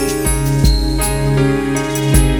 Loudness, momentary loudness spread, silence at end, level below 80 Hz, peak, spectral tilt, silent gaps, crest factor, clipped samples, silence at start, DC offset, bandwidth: -15 LUFS; 3 LU; 0 s; -18 dBFS; 0 dBFS; -5 dB/octave; none; 14 dB; under 0.1%; 0 s; under 0.1%; 18.5 kHz